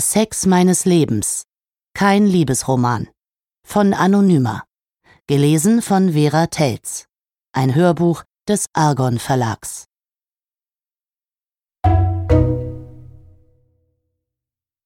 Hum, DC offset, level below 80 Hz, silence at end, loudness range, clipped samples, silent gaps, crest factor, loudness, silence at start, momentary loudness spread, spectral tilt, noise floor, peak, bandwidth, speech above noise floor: none; under 0.1%; -36 dBFS; 1.85 s; 5 LU; under 0.1%; none; 16 dB; -16 LUFS; 0 s; 13 LU; -5.5 dB/octave; under -90 dBFS; -2 dBFS; 16.5 kHz; over 75 dB